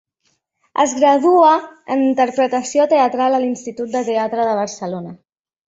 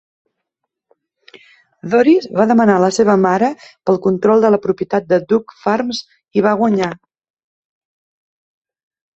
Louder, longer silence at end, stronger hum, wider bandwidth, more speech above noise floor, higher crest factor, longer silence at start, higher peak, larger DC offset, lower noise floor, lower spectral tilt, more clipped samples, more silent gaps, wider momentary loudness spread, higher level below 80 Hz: about the same, -16 LUFS vs -15 LUFS; second, 0.5 s vs 2.25 s; neither; about the same, 8.2 kHz vs 8.2 kHz; second, 51 dB vs 63 dB; about the same, 16 dB vs 16 dB; second, 0.75 s vs 1.85 s; about the same, -2 dBFS vs -2 dBFS; neither; second, -67 dBFS vs -77 dBFS; second, -4.5 dB/octave vs -6 dB/octave; neither; neither; first, 13 LU vs 10 LU; second, -66 dBFS vs -58 dBFS